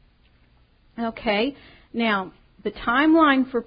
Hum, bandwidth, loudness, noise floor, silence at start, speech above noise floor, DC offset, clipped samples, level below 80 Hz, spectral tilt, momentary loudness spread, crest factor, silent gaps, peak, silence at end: none; 5.2 kHz; -21 LUFS; -58 dBFS; 0.95 s; 36 dB; under 0.1%; under 0.1%; -52 dBFS; -9.5 dB/octave; 17 LU; 16 dB; none; -6 dBFS; 0.05 s